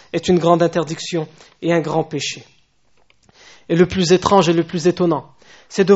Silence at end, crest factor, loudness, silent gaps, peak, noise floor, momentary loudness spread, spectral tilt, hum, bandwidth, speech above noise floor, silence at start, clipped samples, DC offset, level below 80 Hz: 0 s; 18 dB; -17 LUFS; none; 0 dBFS; -59 dBFS; 12 LU; -5.5 dB/octave; none; 8 kHz; 43 dB; 0.15 s; under 0.1%; under 0.1%; -50 dBFS